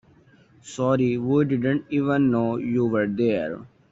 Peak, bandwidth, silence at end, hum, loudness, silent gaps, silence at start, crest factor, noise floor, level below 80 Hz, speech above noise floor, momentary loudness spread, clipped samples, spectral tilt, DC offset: -10 dBFS; 8 kHz; 0.25 s; none; -23 LUFS; none; 0.65 s; 14 dB; -55 dBFS; -60 dBFS; 33 dB; 7 LU; under 0.1%; -7.5 dB/octave; under 0.1%